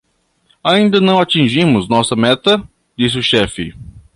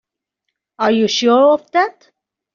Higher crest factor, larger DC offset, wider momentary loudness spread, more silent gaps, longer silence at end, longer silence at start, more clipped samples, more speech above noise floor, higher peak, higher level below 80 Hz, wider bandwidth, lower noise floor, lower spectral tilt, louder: about the same, 14 dB vs 14 dB; neither; about the same, 9 LU vs 8 LU; neither; second, 0.15 s vs 0.65 s; second, 0.65 s vs 0.8 s; neither; second, 45 dB vs 63 dB; about the same, 0 dBFS vs -2 dBFS; first, -42 dBFS vs -64 dBFS; first, 11.5 kHz vs 7.4 kHz; second, -58 dBFS vs -77 dBFS; first, -5 dB/octave vs -2 dB/octave; about the same, -13 LUFS vs -15 LUFS